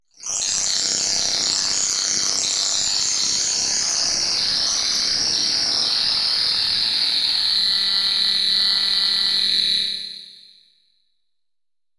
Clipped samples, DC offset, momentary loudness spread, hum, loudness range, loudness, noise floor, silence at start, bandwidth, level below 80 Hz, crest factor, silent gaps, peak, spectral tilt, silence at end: under 0.1%; under 0.1%; 2 LU; none; 2 LU; -17 LUFS; under -90 dBFS; 0.2 s; 12 kHz; -58 dBFS; 18 dB; none; -4 dBFS; 1.5 dB/octave; 1.65 s